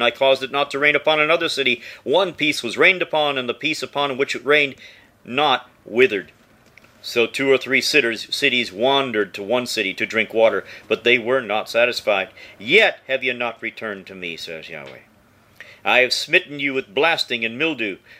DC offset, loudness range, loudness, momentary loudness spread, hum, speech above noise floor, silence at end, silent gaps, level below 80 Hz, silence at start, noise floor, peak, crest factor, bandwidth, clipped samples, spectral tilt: under 0.1%; 4 LU; -19 LUFS; 12 LU; none; 34 dB; 0.05 s; none; -66 dBFS; 0 s; -54 dBFS; 0 dBFS; 20 dB; 16 kHz; under 0.1%; -3 dB/octave